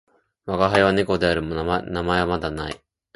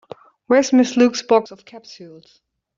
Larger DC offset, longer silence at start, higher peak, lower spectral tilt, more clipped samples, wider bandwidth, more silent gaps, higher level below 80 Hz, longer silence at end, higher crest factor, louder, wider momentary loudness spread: neither; about the same, 0.45 s vs 0.5 s; about the same, -2 dBFS vs -2 dBFS; first, -6 dB/octave vs -3.5 dB/octave; neither; first, 11.5 kHz vs 7.6 kHz; neither; first, -42 dBFS vs -64 dBFS; second, 0.4 s vs 0.7 s; about the same, 20 dB vs 16 dB; second, -22 LUFS vs -16 LUFS; second, 14 LU vs 23 LU